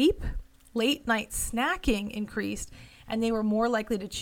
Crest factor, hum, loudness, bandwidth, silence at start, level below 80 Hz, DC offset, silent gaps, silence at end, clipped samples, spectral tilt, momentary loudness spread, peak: 18 dB; none; -29 LUFS; 17.5 kHz; 0 s; -42 dBFS; under 0.1%; none; 0 s; under 0.1%; -4 dB/octave; 11 LU; -12 dBFS